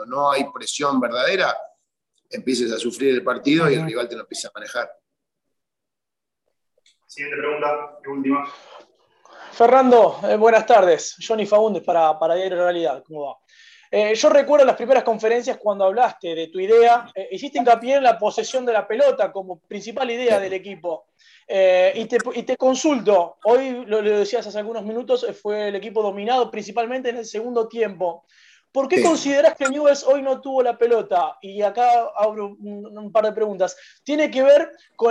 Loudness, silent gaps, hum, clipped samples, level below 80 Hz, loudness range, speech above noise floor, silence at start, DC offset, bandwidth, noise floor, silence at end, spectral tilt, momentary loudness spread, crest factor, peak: -19 LUFS; none; none; under 0.1%; -72 dBFS; 8 LU; 67 dB; 0 s; under 0.1%; 12 kHz; -86 dBFS; 0 s; -4 dB/octave; 14 LU; 18 dB; -2 dBFS